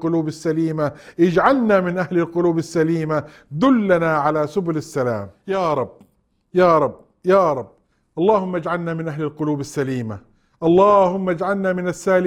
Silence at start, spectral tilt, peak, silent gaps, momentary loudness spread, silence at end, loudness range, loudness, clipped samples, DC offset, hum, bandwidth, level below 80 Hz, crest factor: 0 s; -7 dB/octave; -2 dBFS; none; 10 LU; 0 s; 3 LU; -19 LUFS; under 0.1%; under 0.1%; none; 13 kHz; -54 dBFS; 18 dB